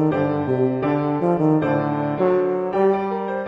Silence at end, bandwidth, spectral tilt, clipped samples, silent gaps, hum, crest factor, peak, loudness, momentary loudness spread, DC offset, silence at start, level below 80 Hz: 0 s; 5.8 kHz; -10 dB/octave; under 0.1%; none; none; 12 dB; -6 dBFS; -20 LUFS; 3 LU; under 0.1%; 0 s; -54 dBFS